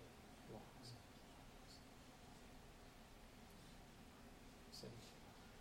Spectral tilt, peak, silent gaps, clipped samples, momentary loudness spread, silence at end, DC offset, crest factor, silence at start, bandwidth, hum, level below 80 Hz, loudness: -4 dB/octave; -42 dBFS; none; under 0.1%; 5 LU; 0 s; under 0.1%; 18 dB; 0 s; 16.5 kHz; none; -68 dBFS; -61 LUFS